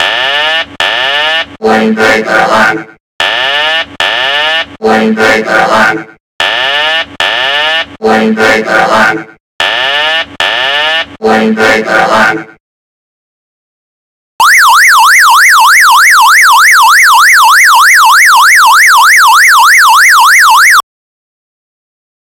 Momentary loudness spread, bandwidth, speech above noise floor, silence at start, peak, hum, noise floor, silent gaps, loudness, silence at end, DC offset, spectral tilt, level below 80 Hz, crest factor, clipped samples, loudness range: 8 LU; over 20 kHz; over 83 dB; 0 s; 0 dBFS; none; under -90 dBFS; 3.00-3.19 s, 6.20-6.39 s, 9.40-9.59 s, 12.60-14.39 s; -4 LUFS; 1.6 s; under 0.1%; -1 dB/octave; -46 dBFS; 6 dB; 5%; 7 LU